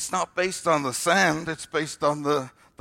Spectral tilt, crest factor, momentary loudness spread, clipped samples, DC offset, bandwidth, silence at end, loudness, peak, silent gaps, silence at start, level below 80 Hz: -3.5 dB/octave; 18 dB; 8 LU; under 0.1%; under 0.1%; 16 kHz; 0.3 s; -24 LUFS; -8 dBFS; none; 0 s; -62 dBFS